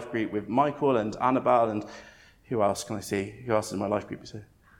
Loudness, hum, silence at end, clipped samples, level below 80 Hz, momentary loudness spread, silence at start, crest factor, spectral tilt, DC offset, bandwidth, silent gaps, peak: -27 LUFS; none; 0.35 s; under 0.1%; -60 dBFS; 17 LU; 0 s; 20 dB; -6 dB/octave; under 0.1%; 17.5 kHz; none; -8 dBFS